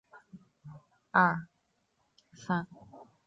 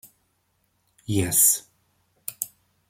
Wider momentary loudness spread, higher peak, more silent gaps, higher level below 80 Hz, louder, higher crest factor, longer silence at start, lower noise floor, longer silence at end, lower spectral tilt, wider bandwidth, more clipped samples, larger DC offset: first, 27 LU vs 21 LU; second, -10 dBFS vs -6 dBFS; neither; second, -72 dBFS vs -60 dBFS; second, -30 LUFS vs -21 LUFS; about the same, 24 dB vs 22 dB; second, 0.15 s vs 1.1 s; first, -76 dBFS vs -70 dBFS; second, 0.25 s vs 0.4 s; first, -7 dB/octave vs -3 dB/octave; second, 7.6 kHz vs 16.5 kHz; neither; neither